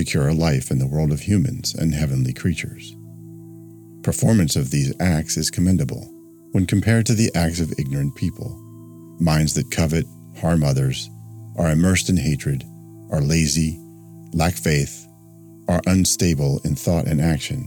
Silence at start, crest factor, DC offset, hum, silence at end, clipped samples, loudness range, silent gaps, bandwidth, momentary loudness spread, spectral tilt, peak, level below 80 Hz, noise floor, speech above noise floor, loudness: 0 s; 16 dB; under 0.1%; none; 0 s; under 0.1%; 3 LU; none; 19 kHz; 17 LU; -5.5 dB/octave; -6 dBFS; -38 dBFS; -44 dBFS; 25 dB; -20 LUFS